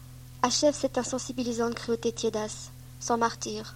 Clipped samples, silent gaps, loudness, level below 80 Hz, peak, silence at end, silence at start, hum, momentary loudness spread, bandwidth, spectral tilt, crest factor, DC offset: under 0.1%; none; -29 LUFS; -54 dBFS; -10 dBFS; 0 s; 0 s; none; 13 LU; 16.5 kHz; -3.5 dB/octave; 20 dB; under 0.1%